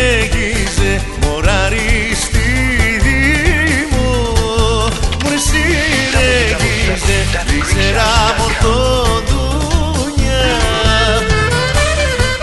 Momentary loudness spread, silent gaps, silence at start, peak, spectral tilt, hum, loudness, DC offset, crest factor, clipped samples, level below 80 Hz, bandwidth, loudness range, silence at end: 4 LU; none; 0 s; 0 dBFS; -4 dB/octave; none; -13 LUFS; under 0.1%; 12 dB; under 0.1%; -18 dBFS; 12 kHz; 1 LU; 0 s